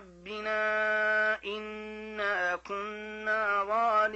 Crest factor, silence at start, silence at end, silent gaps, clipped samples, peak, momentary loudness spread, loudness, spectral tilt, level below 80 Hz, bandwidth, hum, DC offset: 12 dB; 0 s; 0 s; none; under 0.1%; -18 dBFS; 12 LU; -30 LUFS; -3.5 dB/octave; -64 dBFS; 8.2 kHz; none; under 0.1%